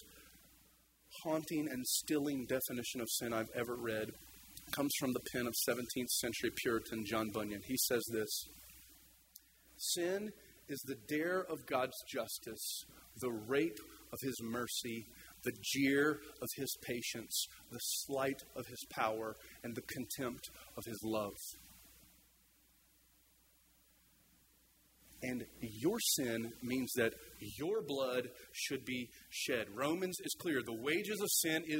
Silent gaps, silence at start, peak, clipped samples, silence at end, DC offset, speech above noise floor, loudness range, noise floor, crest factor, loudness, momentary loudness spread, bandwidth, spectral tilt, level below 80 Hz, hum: none; 0 s; -20 dBFS; under 0.1%; 0 s; under 0.1%; 31 dB; 7 LU; -70 dBFS; 22 dB; -39 LUFS; 14 LU; 16 kHz; -3 dB/octave; -70 dBFS; none